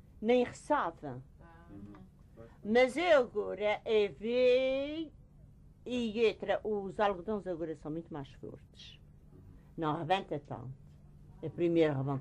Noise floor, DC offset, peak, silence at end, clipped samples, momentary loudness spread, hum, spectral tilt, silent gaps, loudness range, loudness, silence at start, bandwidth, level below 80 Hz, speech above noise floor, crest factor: -57 dBFS; under 0.1%; -16 dBFS; 0 s; under 0.1%; 23 LU; none; -6.5 dB/octave; none; 9 LU; -32 LUFS; 0.2 s; 11 kHz; -60 dBFS; 25 dB; 18 dB